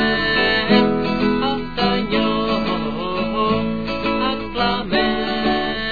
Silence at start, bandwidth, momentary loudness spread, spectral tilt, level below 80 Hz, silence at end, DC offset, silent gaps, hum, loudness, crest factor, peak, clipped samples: 0 s; 5 kHz; 6 LU; -7 dB/octave; -40 dBFS; 0 s; 2%; none; none; -19 LUFS; 16 dB; -2 dBFS; under 0.1%